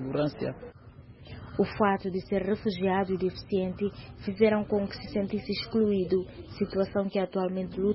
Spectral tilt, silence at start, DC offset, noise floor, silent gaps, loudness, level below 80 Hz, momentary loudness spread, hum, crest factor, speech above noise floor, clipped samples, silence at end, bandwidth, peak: -10.5 dB/octave; 0 s; under 0.1%; -50 dBFS; none; -29 LUFS; -54 dBFS; 11 LU; none; 18 dB; 21 dB; under 0.1%; 0 s; 5.8 kHz; -10 dBFS